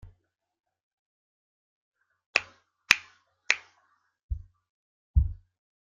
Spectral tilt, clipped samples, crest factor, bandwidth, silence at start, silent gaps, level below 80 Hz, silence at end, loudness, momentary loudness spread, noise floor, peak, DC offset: -1.5 dB/octave; under 0.1%; 34 dB; 7.4 kHz; 2.35 s; 4.23-4.29 s, 4.70-5.14 s; -40 dBFS; 0.55 s; -27 LUFS; 17 LU; -72 dBFS; 0 dBFS; under 0.1%